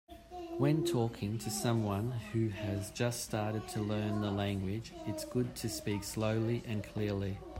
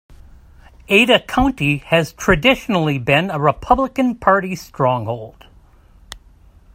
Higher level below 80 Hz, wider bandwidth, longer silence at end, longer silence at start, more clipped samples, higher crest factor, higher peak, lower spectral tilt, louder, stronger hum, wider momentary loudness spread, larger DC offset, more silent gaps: second, -58 dBFS vs -38 dBFS; about the same, 16 kHz vs 16 kHz; second, 0 s vs 0.6 s; second, 0.1 s vs 0.9 s; neither; about the same, 18 dB vs 18 dB; second, -18 dBFS vs 0 dBFS; about the same, -6 dB/octave vs -5.5 dB/octave; second, -36 LUFS vs -16 LUFS; neither; about the same, 7 LU vs 6 LU; neither; neither